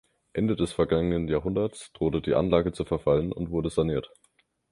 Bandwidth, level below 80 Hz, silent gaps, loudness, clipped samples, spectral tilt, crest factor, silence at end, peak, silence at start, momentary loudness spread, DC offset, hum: 11.5 kHz; -44 dBFS; none; -27 LUFS; under 0.1%; -7.5 dB/octave; 20 dB; 0.65 s; -8 dBFS; 0.35 s; 5 LU; under 0.1%; none